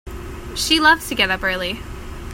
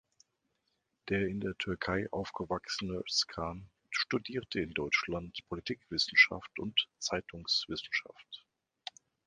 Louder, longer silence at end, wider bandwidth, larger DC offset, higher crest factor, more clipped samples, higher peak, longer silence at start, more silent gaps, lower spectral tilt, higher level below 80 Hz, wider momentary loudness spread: first, -17 LUFS vs -33 LUFS; second, 0 s vs 0.9 s; first, 16.5 kHz vs 10 kHz; neither; second, 20 dB vs 26 dB; neither; first, 0 dBFS vs -10 dBFS; second, 0.05 s vs 1.05 s; neither; about the same, -2.5 dB/octave vs -3 dB/octave; first, -36 dBFS vs -60 dBFS; about the same, 20 LU vs 19 LU